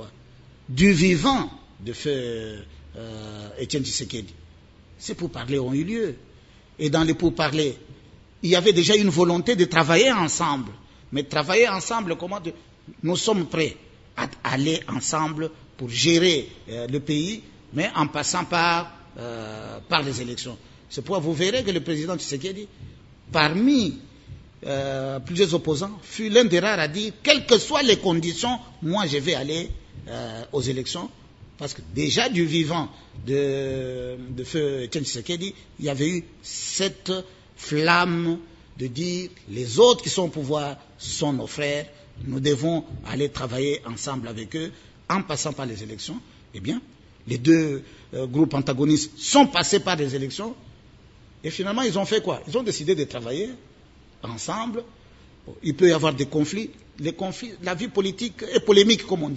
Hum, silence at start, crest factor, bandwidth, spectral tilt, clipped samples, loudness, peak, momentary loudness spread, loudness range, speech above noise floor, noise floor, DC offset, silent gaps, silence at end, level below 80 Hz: none; 0 s; 24 dB; 8 kHz; -4.5 dB/octave; under 0.1%; -23 LUFS; 0 dBFS; 18 LU; 8 LU; 28 dB; -51 dBFS; under 0.1%; none; 0 s; -52 dBFS